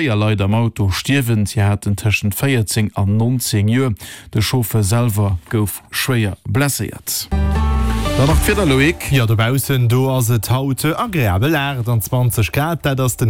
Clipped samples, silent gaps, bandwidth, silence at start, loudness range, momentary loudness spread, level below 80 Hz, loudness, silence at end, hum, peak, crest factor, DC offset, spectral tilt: under 0.1%; none; 17 kHz; 0 s; 3 LU; 5 LU; -28 dBFS; -17 LUFS; 0 s; none; -4 dBFS; 12 dB; 0.3%; -5.5 dB/octave